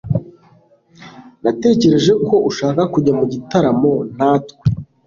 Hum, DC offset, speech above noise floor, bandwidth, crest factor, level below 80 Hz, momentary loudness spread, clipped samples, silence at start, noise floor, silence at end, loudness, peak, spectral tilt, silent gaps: none; under 0.1%; 36 dB; 7.4 kHz; 14 dB; -44 dBFS; 8 LU; under 0.1%; 0.05 s; -51 dBFS; 0.25 s; -16 LUFS; -2 dBFS; -7 dB/octave; none